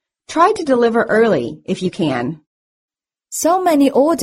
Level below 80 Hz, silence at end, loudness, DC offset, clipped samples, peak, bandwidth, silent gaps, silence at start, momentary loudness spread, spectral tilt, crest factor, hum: -56 dBFS; 0 s; -16 LUFS; under 0.1%; under 0.1%; 0 dBFS; 16 kHz; 2.47-2.88 s; 0.3 s; 11 LU; -5 dB/octave; 16 dB; none